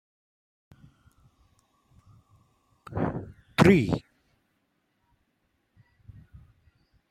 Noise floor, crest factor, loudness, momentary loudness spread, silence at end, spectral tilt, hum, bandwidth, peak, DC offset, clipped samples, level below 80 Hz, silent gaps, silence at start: -74 dBFS; 26 dB; -25 LUFS; 17 LU; 3.1 s; -7 dB/octave; none; 15 kHz; -6 dBFS; under 0.1%; under 0.1%; -54 dBFS; none; 2.9 s